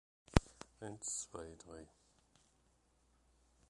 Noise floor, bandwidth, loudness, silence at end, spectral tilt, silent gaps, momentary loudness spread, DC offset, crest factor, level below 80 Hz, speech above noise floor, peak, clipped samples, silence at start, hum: -75 dBFS; 11.5 kHz; -40 LUFS; 1.85 s; -4.5 dB/octave; none; 20 LU; under 0.1%; 36 dB; -50 dBFS; 26 dB; -8 dBFS; under 0.1%; 0.35 s; none